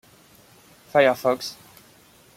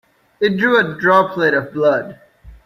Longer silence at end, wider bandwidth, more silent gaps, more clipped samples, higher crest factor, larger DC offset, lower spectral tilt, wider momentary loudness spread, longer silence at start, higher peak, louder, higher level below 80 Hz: first, 0.85 s vs 0.1 s; about the same, 16.5 kHz vs 15 kHz; neither; neither; about the same, 20 dB vs 16 dB; neither; second, -4 dB/octave vs -6.5 dB/octave; first, 17 LU vs 7 LU; first, 0.95 s vs 0.4 s; second, -6 dBFS vs -2 dBFS; second, -22 LUFS vs -15 LUFS; second, -68 dBFS vs -50 dBFS